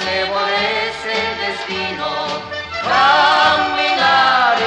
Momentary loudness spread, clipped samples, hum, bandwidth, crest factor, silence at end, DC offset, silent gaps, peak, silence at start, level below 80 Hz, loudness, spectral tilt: 11 LU; under 0.1%; none; 9.8 kHz; 16 dB; 0 s; under 0.1%; none; 0 dBFS; 0 s; -50 dBFS; -15 LUFS; -2.5 dB/octave